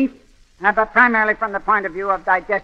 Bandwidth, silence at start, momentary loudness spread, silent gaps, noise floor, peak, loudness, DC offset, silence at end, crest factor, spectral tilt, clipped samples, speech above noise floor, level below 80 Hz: 8.2 kHz; 0 s; 8 LU; none; -48 dBFS; 0 dBFS; -17 LUFS; under 0.1%; 0 s; 18 dB; -6.5 dB/octave; under 0.1%; 30 dB; -48 dBFS